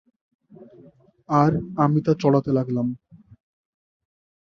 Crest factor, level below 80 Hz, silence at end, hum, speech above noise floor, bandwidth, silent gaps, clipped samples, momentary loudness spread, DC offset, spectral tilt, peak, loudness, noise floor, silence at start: 20 dB; -58 dBFS; 1.55 s; none; 32 dB; 7 kHz; none; under 0.1%; 7 LU; under 0.1%; -9 dB/octave; -4 dBFS; -21 LUFS; -52 dBFS; 0.6 s